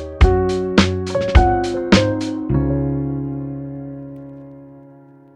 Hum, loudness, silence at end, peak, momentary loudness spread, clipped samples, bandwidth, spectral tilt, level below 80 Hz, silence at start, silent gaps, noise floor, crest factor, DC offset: none; -18 LUFS; 0.55 s; 0 dBFS; 19 LU; under 0.1%; 10.5 kHz; -6.5 dB/octave; -24 dBFS; 0 s; none; -44 dBFS; 18 dB; under 0.1%